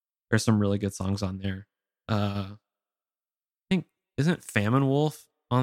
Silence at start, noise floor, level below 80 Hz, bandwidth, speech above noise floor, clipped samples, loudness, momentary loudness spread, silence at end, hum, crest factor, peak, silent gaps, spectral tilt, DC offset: 0.3 s; under -90 dBFS; -60 dBFS; 15.5 kHz; over 64 dB; under 0.1%; -28 LUFS; 15 LU; 0 s; none; 22 dB; -6 dBFS; none; -6.5 dB/octave; under 0.1%